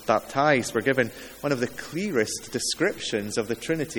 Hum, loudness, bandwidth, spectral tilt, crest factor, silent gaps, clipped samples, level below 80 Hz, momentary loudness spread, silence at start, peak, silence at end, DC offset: none; -26 LUFS; 19 kHz; -4 dB/octave; 22 dB; none; under 0.1%; -58 dBFS; 7 LU; 0 s; -4 dBFS; 0 s; under 0.1%